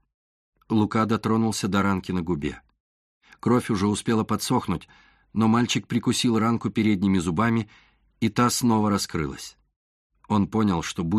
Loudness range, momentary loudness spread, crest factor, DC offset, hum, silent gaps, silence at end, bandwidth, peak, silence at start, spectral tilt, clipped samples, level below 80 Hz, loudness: 3 LU; 9 LU; 18 dB; under 0.1%; none; 2.80-3.21 s, 9.76-10.10 s; 0 s; 13.5 kHz; -8 dBFS; 0.7 s; -5.5 dB/octave; under 0.1%; -52 dBFS; -24 LUFS